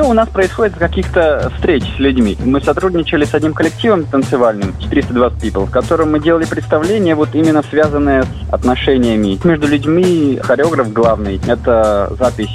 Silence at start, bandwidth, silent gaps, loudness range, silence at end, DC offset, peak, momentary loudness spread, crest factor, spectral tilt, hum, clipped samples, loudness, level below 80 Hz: 0 s; 13.5 kHz; none; 1 LU; 0 s; under 0.1%; -2 dBFS; 4 LU; 12 dB; -6.5 dB/octave; none; under 0.1%; -13 LUFS; -26 dBFS